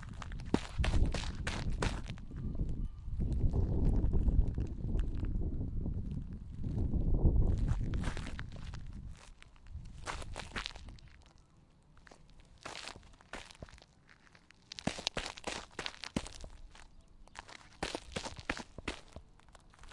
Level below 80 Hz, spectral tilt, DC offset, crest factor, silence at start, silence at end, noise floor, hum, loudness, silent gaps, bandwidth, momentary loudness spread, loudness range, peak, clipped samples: -38 dBFS; -5.5 dB/octave; under 0.1%; 26 dB; 0 s; 0 s; -64 dBFS; none; -39 LUFS; none; 11.5 kHz; 20 LU; 12 LU; -10 dBFS; under 0.1%